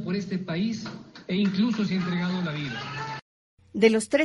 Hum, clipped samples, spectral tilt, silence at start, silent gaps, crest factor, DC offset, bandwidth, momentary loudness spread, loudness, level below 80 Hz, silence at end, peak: none; under 0.1%; -6 dB/octave; 0 s; 3.22-3.57 s; 20 dB; under 0.1%; 11.5 kHz; 15 LU; -27 LUFS; -64 dBFS; 0 s; -6 dBFS